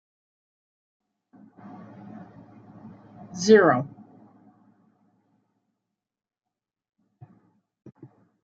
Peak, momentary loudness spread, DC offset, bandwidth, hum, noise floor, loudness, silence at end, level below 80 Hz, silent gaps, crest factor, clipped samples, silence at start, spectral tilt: -4 dBFS; 31 LU; under 0.1%; 7.4 kHz; none; -88 dBFS; -19 LUFS; 4.55 s; -72 dBFS; none; 26 dB; under 0.1%; 3.35 s; -4.5 dB/octave